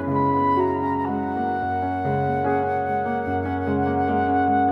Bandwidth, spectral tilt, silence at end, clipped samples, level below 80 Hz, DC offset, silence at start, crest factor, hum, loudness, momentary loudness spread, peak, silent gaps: 5.4 kHz; -9.5 dB/octave; 0 s; under 0.1%; -52 dBFS; under 0.1%; 0 s; 12 dB; none; -23 LUFS; 5 LU; -10 dBFS; none